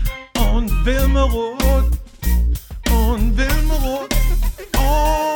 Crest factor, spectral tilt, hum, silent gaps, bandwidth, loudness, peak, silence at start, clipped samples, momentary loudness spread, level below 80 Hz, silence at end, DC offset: 14 dB; -5.5 dB/octave; none; none; 19.5 kHz; -19 LUFS; -2 dBFS; 0 s; under 0.1%; 5 LU; -18 dBFS; 0 s; under 0.1%